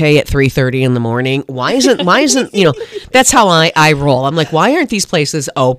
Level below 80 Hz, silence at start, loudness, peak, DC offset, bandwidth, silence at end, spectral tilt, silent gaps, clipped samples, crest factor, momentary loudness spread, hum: -34 dBFS; 0 s; -11 LUFS; 0 dBFS; under 0.1%; 16 kHz; 0 s; -4 dB/octave; none; 0.2%; 12 dB; 7 LU; none